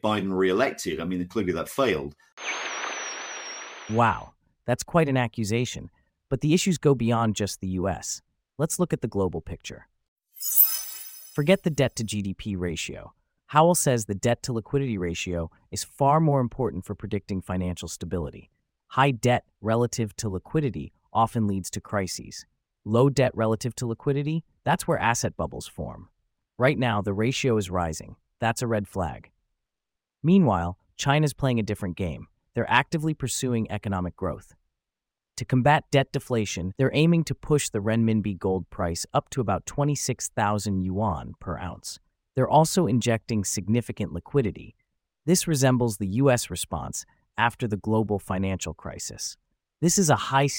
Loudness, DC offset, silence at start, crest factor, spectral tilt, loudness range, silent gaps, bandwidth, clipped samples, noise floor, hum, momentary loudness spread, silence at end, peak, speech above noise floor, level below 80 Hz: -26 LUFS; under 0.1%; 0.05 s; 22 dB; -5 dB/octave; 4 LU; 2.32-2.37 s, 10.08-10.16 s; 17 kHz; under 0.1%; -88 dBFS; none; 13 LU; 0 s; -4 dBFS; 63 dB; -50 dBFS